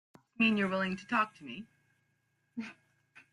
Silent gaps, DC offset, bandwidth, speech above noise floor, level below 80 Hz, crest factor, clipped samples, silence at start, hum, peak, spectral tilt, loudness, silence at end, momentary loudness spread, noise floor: none; under 0.1%; 11 kHz; 45 dB; -76 dBFS; 20 dB; under 0.1%; 0.4 s; none; -16 dBFS; -6 dB/octave; -31 LUFS; 0.6 s; 19 LU; -77 dBFS